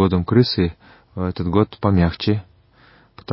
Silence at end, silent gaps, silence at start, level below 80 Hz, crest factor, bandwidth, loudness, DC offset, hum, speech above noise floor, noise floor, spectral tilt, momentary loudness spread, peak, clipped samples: 0 s; none; 0 s; -34 dBFS; 18 dB; 5.8 kHz; -19 LUFS; under 0.1%; none; 34 dB; -52 dBFS; -11.5 dB/octave; 10 LU; -2 dBFS; under 0.1%